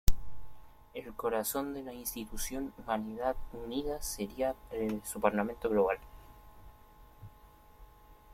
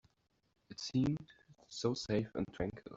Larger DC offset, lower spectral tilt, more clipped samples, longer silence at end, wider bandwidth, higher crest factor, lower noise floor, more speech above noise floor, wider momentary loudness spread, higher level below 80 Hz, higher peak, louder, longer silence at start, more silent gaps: neither; second, -4.5 dB/octave vs -6 dB/octave; neither; first, 0.2 s vs 0 s; first, 16.5 kHz vs 8 kHz; first, 26 dB vs 18 dB; second, -58 dBFS vs -75 dBFS; second, 23 dB vs 37 dB; first, 24 LU vs 11 LU; first, -44 dBFS vs -62 dBFS; first, -8 dBFS vs -20 dBFS; first, -35 LUFS vs -38 LUFS; second, 0.05 s vs 0.7 s; neither